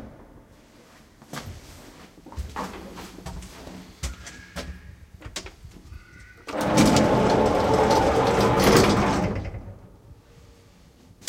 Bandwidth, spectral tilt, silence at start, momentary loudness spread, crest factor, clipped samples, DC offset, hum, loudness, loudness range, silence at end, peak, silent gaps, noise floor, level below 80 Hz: 16.5 kHz; -5 dB/octave; 0 s; 25 LU; 22 dB; under 0.1%; under 0.1%; none; -21 LUFS; 19 LU; 1.15 s; -4 dBFS; none; -53 dBFS; -40 dBFS